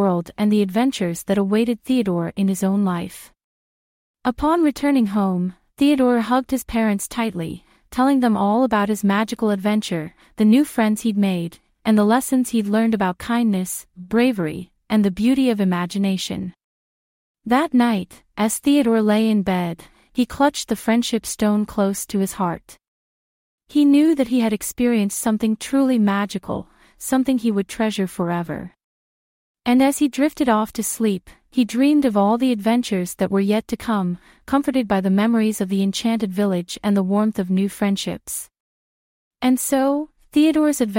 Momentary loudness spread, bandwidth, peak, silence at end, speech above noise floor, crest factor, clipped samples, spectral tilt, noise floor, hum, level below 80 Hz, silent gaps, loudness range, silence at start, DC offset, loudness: 10 LU; 16.5 kHz; -4 dBFS; 0 s; over 71 dB; 16 dB; under 0.1%; -5.5 dB/octave; under -90 dBFS; none; -52 dBFS; 3.44-4.14 s, 16.64-17.35 s, 22.88-23.58 s, 28.84-29.55 s, 38.60-39.31 s; 3 LU; 0 s; under 0.1%; -20 LUFS